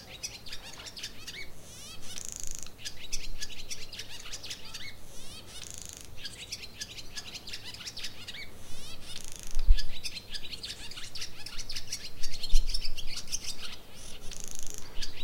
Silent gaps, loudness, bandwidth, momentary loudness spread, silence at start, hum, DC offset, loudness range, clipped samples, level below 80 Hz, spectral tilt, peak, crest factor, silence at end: none; -39 LUFS; 15.5 kHz; 10 LU; 0 s; none; under 0.1%; 4 LU; under 0.1%; -34 dBFS; -1.5 dB/octave; -6 dBFS; 22 dB; 0 s